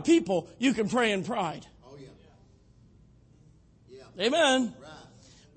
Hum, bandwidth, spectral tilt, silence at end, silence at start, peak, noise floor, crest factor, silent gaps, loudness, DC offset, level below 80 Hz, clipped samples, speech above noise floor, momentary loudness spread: none; 8.8 kHz; -4 dB/octave; 0.55 s; 0 s; -10 dBFS; -58 dBFS; 20 dB; none; -27 LUFS; under 0.1%; -64 dBFS; under 0.1%; 32 dB; 25 LU